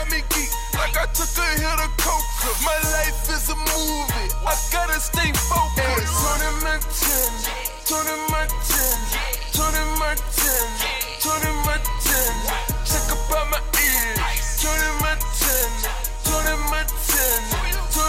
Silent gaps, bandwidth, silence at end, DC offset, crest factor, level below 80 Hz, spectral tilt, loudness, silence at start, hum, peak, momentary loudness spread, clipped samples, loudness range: none; 16.5 kHz; 0 s; under 0.1%; 16 dB; -26 dBFS; -2 dB/octave; -21 LUFS; 0 s; none; -6 dBFS; 5 LU; under 0.1%; 1 LU